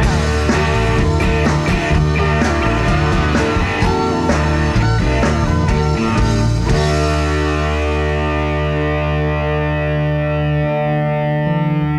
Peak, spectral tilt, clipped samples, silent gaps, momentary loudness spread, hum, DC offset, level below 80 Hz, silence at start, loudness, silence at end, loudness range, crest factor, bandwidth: -2 dBFS; -6.5 dB/octave; under 0.1%; none; 2 LU; none; under 0.1%; -22 dBFS; 0 s; -16 LUFS; 0 s; 2 LU; 12 dB; 11.5 kHz